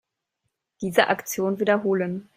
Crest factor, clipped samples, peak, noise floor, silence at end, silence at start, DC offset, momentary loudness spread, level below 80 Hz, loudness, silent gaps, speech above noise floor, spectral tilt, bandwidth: 22 dB; under 0.1%; -2 dBFS; -79 dBFS; 0.15 s; 0.8 s; under 0.1%; 5 LU; -68 dBFS; -23 LUFS; none; 56 dB; -4.5 dB/octave; 16 kHz